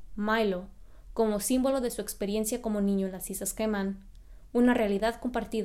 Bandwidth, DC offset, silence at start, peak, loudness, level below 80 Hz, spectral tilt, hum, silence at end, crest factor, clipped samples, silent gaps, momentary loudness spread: 16 kHz; under 0.1%; 0 s; -12 dBFS; -29 LUFS; -50 dBFS; -4.5 dB/octave; none; 0 s; 18 dB; under 0.1%; none; 8 LU